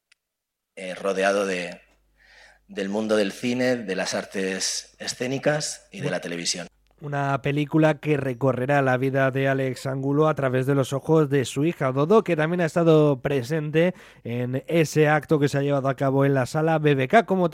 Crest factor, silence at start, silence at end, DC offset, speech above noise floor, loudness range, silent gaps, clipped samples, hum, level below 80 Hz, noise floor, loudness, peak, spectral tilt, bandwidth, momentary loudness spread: 18 dB; 0.75 s; 0 s; under 0.1%; 61 dB; 6 LU; none; under 0.1%; none; -62 dBFS; -83 dBFS; -23 LUFS; -4 dBFS; -5.5 dB/octave; 15.5 kHz; 10 LU